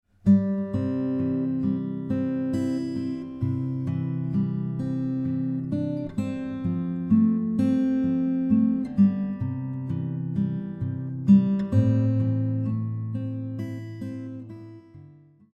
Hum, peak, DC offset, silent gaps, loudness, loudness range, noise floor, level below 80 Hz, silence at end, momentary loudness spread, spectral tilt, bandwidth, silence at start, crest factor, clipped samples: none; -8 dBFS; under 0.1%; none; -26 LUFS; 5 LU; -51 dBFS; -56 dBFS; 0.45 s; 11 LU; -10.5 dB/octave; 8.2 kHz; 0.25 s; 18 dB; under 0.1%